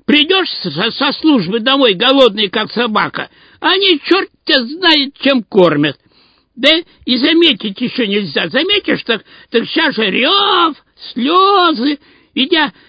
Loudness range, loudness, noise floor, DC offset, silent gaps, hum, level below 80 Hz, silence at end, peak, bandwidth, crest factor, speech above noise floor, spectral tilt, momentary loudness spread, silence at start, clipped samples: 1 LU; -12 LUFS; -52 dBFS; under 0.1%; none; none; -56 dBFS; 0.2 s; 0 dBFS; 8 kHz; 14 dB; 39 dB; -6 dB/octave; 9 LU; 0.1 s; 0.1%